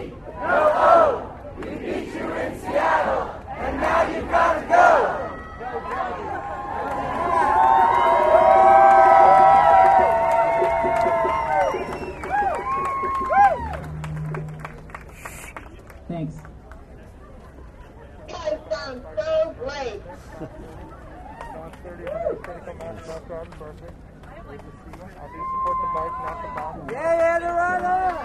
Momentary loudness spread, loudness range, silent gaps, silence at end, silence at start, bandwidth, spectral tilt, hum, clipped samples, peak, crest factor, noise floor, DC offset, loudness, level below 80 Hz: 24 LU; 20 LU; none; 0 s; 0 s; 12.5 kHz; -6 dB/octave; none; under 0.1%; -2 dBFS; 18 dB; -42 dBFS; under 0.1%; -19 LUFS; -44 dBFS